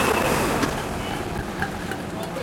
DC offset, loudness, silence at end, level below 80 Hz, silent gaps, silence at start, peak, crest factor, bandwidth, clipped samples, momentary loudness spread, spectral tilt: under 0.1%; -25 LUFS; 0 s; -40 dBFS; none; 0 s; -8 dBFS; 18 dB; 17 kHz; under 0.1%; 9 LU; -4.5 dB/octave